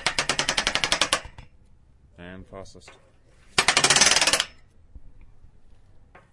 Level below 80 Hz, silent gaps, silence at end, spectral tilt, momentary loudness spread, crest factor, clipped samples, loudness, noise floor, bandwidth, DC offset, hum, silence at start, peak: -50 dBFS; none; 0.85 s; 0 dB/octave; 27 LU; 24 dB; under 0.1%; -20 LUFS; -54 dBFS; 12 kHz; under 0.1%; none; 0 s; -2 dBFS